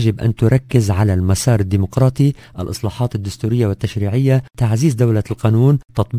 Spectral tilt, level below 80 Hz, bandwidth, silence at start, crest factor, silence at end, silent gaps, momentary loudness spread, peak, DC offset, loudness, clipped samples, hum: -7 dB/octave; -32 dBFS; 15.5 kHz; 0 s; 16 dB; 0 s; none; 7 LU; 0 dBFS; under 0.1%; -16 LUFS; under 0.1%; none